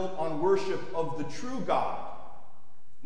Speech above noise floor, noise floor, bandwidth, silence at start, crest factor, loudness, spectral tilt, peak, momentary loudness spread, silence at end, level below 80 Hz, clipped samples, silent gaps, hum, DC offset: 34 dB; -64 dBFS; 10.5 kHz; 0 s; 18 dB; -31 LUFS; -6 dB/octave; -14 dBFS; 16 LU; 0.65 s; -64 dBFS; under 0.1%; none; none; 3%